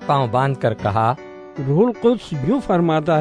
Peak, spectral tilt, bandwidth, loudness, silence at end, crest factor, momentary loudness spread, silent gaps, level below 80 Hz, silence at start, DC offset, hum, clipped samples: -2 dBFS; -8 dB/octave; 10 kHz; -19 LUFS; 0 s; 16 dB; 6 LU; none; -48 dBFS; 0 s; under 0.1%; none; under 0.1%